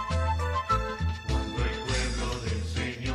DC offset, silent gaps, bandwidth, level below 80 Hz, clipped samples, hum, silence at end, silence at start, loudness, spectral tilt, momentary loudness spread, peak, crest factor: under 0.1%; none; 12 kHz; -34 dBFS; under 0.1%; none; 0 s; 0 s; -30 LUFS; -5 dB/octave; 4 LU; -14 dBFS; 16 dB